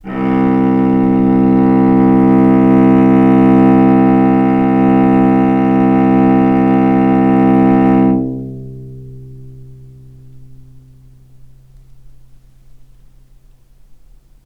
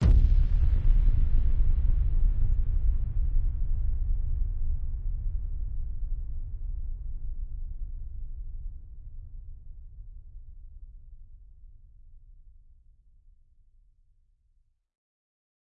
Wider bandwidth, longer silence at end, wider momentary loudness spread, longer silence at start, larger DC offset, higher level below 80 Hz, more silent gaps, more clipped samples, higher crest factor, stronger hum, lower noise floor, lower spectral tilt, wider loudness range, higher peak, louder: first, 3.9 kHz vs 2.1 kHz; first, 4 s vs 3.45 s; second, 6 LU vs 23 LU; about the same, 0.05 s vs 0 s; neither; second, -40 dBFS vs -28 dBFS; neither; neither; about the same, 12 dB vs 16 dB; neither; second, -44 dBFS vs -67 dBFS; about the same, -10.5 dB/octave vs -9.5 dB/octave; second, 7 LU vs 23 LU; first, 0 dBFS vs -10 dBFS; first, -10 LUFS vs -32 LUFS